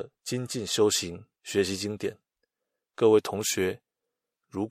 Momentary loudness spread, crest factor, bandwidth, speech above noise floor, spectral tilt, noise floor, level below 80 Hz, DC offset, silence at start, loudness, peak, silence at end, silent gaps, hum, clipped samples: 15 LU; 20 dB; 16 kHz; 59 dB; -3.5 dB/octave; -86 dBFS; -68 dBFS; under 0.1%; 0 s; -27 LUFS; -8 dBFS; 0 s; none; none; under 0.1%